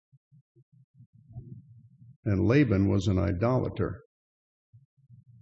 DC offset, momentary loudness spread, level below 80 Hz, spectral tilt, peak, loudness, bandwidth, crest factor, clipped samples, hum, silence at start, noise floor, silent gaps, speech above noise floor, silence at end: under 0.1%; 25 LU; -58 dBFS; -8.5 dB/octave; -12 dBFS; -27 LUFS; 7.8 kHz; 18 dB; under 0.1%; none; 1.35 s; -54 dBFS; 2.16-2.23 s; 29 dB; 1.45 s